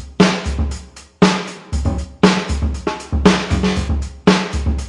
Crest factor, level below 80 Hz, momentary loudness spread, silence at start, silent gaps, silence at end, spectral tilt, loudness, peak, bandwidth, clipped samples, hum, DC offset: 16 dB; -26 dBFS; 9 LU; 0 s; none; 0 s; -5.5 dB/octave; -17 LUFS; 0 dBFS; 11 kHz; under 0.1%; none; under 0.1%